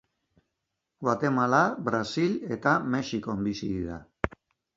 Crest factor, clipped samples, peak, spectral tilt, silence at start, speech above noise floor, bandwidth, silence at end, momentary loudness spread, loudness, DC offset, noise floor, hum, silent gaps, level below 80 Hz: 24 dB; under 0.1%; -4 dBFS; -6 dB/octave; 1 s; 56 dB; 7.8 kHz; 0.5 s; 11 LU; -28 LUFS; under 0.1%; -83 dBFS; none; none; -52 dBFS